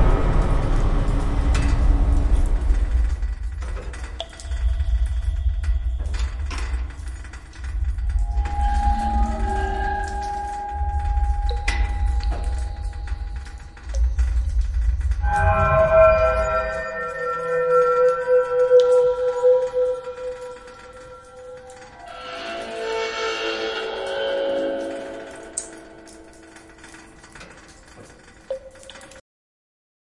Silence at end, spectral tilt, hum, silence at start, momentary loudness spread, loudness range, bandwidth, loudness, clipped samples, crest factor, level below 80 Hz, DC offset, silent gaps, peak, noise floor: 0.95 s; -6 dB/octave; none; 0 s; 22 LU; 14 LU; 11 kHz; -23 LUFS; under 0.1%; 18 dB; -24 dBFS; under 0.1%; none; -4 dBFS; -46 dBFS